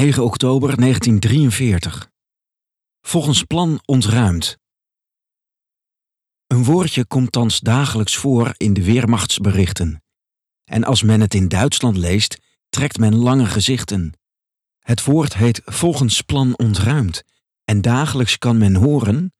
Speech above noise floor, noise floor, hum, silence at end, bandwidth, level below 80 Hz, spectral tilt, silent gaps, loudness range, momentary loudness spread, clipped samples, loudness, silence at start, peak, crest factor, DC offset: 72 dB; -87 dBFS; none; 0.1 s; 13.5 kHz; -40 dBFS; -5 dB/octave; none; 3 LU; 9 LU; under 0.1%; -16 LUFS; 0 s; -2 dBFS; 14 dB; under 0.1%